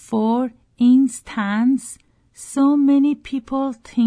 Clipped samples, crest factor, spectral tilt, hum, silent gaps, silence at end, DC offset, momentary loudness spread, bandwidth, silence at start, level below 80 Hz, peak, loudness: under 0.1%; 12 dB; -5.5 dB/octave; none; none; 0 s; under 0.1%; 12 LU; 11 kHz; 0.1 s; -56 dBFS; -6 dBFS; -19 LUFS